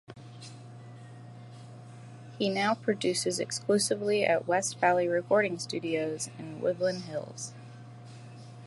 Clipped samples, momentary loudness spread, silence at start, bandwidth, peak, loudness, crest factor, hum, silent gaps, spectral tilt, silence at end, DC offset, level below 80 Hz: under 0.1%; 21 LU; 0.1 s; 12 kHz; -10 dBFS; -29 LUFS; 20 dB; none; none; -4 dB/octave; 0 s; under 0.1%; -76 dBFS